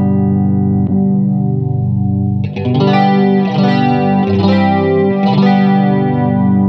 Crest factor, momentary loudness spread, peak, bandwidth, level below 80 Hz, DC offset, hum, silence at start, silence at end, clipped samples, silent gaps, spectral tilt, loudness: 12 dB; 5 LU; 0 dBFS; 5.8 kHz; -56 dBFS; under 0.1%; 50 Hz at -40 dBFS; 0 s; 0 s; under 0.1%; none; -9.5 dB/octave; -12 LUFS